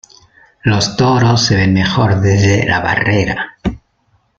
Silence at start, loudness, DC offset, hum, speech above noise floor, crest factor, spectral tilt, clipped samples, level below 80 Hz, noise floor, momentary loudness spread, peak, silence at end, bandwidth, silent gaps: 0.65 s; -13 LUFS; under 0.1%; none; 46 dB; 12 dB; -5.5 dB/octave; under 0.1%; -36 dBFS; -58 dBFS; 9 LU; 0 dBFS; 0.6 s; 7.8 kHz; none